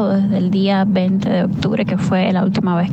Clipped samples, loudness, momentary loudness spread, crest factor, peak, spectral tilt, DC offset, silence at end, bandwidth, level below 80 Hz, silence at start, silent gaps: under 0.1%; -16 LUFS; 3 LU; 12 dB; -4 dBFS; -8 dB/octave; under 0.1%; 0 s; 8.2 kHz; -48 dBFS; 0 s; none